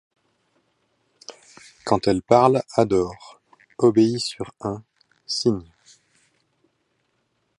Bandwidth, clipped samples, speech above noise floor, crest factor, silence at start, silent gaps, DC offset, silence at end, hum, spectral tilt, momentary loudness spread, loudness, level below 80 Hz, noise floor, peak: 11.5 kHz; under 0.1%; 51 dB; 22 dB; 1.3 s; none; under 0.1%; 2 s; none; -6 dB/octave; 26 LU; -21 LUFS; -54 dBFS; -71 dBFS; -2 dBFS